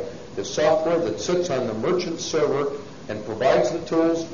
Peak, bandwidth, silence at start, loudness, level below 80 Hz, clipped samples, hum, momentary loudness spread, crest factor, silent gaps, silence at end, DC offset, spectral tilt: -6 dBFS; 7.4 kHz; 0 s; -23 LUFS; -54 dBFS; under 0.1%; none; 12 LU; 16 dB; none; 0 s; 0.5%; -4.5 dB/octave